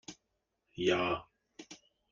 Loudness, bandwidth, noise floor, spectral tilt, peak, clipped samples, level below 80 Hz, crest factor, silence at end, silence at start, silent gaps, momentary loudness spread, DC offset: -33 LUFS; 7.4 kHz; -83 dBFS; -4.5 dB/octave; -16 dBFS; under 0.1%; -68 dBFS; 22 dB; 0.35 s; 0.1 s; none; 24 LU; under 0.1%